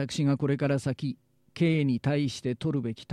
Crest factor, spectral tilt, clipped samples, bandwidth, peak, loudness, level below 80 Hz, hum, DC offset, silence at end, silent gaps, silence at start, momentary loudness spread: 14 dB; -7 dB/octave; under 0.1%; 11.5 kHz; -14 dBFS; -28 LUFS; -62 dBFS; none; under 0.1%; 0 s; none; 0 s; 9 LU